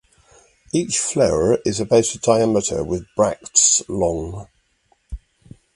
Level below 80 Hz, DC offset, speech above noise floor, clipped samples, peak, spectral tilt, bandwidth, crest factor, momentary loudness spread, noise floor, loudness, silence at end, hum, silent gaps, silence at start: -42 dBFS; under 0.1%; 44 dB; under 0.1%; 0 dBFS; -3.5 dB/octave; 11.5 kHz; 20 dB; 21 LU; -63 dBFS; -18 LUFS; 0.6 s; none; none; 0.75 s